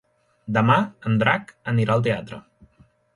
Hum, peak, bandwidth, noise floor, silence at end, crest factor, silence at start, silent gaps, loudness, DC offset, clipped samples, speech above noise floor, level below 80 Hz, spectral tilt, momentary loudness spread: none; -4 dBFS; 11 kHz; -58 dBFS; 0.75 s; 18 dB; 0.45 s; none; -22 LUFS; under 0.1%; under 0.1%; 37 dB; -56 dBFS; -7.5 dB/octave; 19 LU